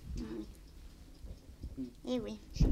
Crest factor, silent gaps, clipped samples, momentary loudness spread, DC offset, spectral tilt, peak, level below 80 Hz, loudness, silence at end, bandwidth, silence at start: 26 dB; none; under 0.1%; 17 LU; under 0.1%; -7 dB/octave; -10 dBFS; -42 dBFS; -42 LUFS; 0 s; 14 kHz; 0 s